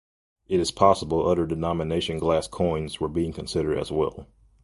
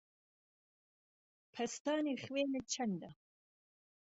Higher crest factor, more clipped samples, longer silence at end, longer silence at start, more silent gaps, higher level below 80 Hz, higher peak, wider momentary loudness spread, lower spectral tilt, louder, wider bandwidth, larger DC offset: about the same, 22 dB vs 18 dB; neither; second, 0.4 s vs 0.9 s; second, 0.5 s vs 1.55 s; second, none vs 1.80-1.85 s; first, -44 dBFS vs -80 dBFS; first, -4 dBFS vs -24 dBFS; about the same, 8 LU vs 10 LU; first, -6 dB/octave vs -4 dB/octave; first, -25 LUFS vs -39 LUFS; first, 11.5 kHz vs 8 kHz; neither